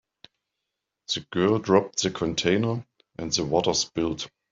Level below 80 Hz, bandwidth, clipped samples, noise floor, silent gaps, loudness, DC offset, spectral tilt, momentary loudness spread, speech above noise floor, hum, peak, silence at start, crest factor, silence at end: -56 dBFS; 7.8 kHz; under 0.1%; -84 dBFS; none; -25 LUFS; under 0.1%; -4 dB/octave; 13 LU; 59 dB; none; -4 dBFS; 1.1 s; 22 dB; 0.25 s